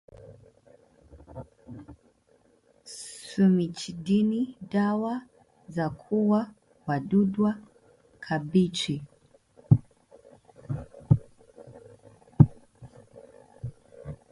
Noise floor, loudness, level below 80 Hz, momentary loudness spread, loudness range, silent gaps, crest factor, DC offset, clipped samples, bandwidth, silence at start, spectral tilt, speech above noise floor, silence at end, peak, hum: -64 dBFS; -27 LUFS; -54 dBFS; 23 LU; 3 LU; none; 26 dB; under 0.1%; under 0.1%; 11.5 kHz; 0.3 s; -7 dB/octave; 38 dB; 0.15 s; -2 dBFS; none